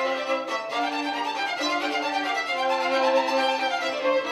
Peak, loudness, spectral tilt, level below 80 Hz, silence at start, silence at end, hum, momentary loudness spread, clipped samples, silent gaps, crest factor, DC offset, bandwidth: -10 dBFS; -25 LUFS; -1.5 dB/octave; -86 dBFS; 0 s; 0 s; none; 5 LU; under 0.1%; none; 14 dB; under 0.1%; 14 kHz